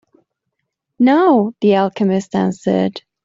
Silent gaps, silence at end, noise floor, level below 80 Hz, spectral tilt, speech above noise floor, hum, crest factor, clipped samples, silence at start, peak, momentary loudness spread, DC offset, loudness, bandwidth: none; 0.25 s; -75 dBFS; -60 dBFS; -7.5 dB/octave; 61 dB; none; 14 dB; under 0.1%; 1 s; -2 dBFS; 6 LU; under 0.1%; -15 LUFS; 7.8 kHz